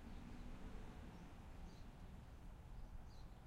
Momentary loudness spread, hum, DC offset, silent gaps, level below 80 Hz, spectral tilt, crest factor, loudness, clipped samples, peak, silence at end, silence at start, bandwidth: 3 LU; none; under 0.1%; none; -56 dBFS; -6.5 dB/octave; 14 dB; -59 LUFS; under 0.1%; -42 dBFS; 0 s; 0 s; 15.5 kHz